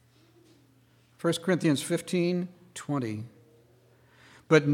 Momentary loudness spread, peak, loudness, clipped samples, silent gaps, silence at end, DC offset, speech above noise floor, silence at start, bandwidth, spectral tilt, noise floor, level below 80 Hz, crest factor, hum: 15 LU; -6 dBFS; -29 LUFS; under 0.1%; none; 0 s; under 0.1%; 34 dB; 1.25 s; 16.5 kHz; -5.5 dB/octave; -62 dBFS; -76 dBFS; 24 dB; none